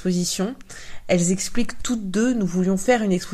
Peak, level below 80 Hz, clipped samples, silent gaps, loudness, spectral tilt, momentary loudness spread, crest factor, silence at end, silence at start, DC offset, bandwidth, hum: -6 dBFS; -40 dBFS; under 0.1%; none; -22 LUFS; -5 dB/octave; 10 LU; 16 dB; 0 s; 0 s; under 0.1%; 14.5 kHz; none